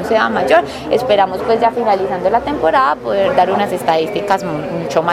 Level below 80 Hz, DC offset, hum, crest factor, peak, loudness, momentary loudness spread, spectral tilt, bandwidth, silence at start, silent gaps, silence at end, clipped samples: -46 dBFS; under 0.1%; none; 14 dB; 0 dBFS; -15 LUFS; 4 LU; -5.5 dB/octave; 15.5 kHz; 0 s; none; 0 s; under 0.1%